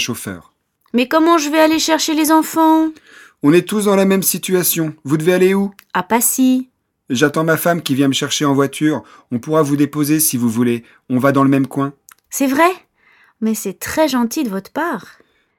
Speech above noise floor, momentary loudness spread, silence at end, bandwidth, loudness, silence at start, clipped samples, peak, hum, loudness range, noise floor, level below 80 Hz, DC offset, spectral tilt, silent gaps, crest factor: 38 dB; 10 LU; 0.55 s; 18.5 kHz; -15 LUFS; 0 s; under 0.1%; 0 dBFS; none; 4 LU; -53 dBFS; -56 dBFS; under 0.1%; -4.5 dB/octave; none; 16 dB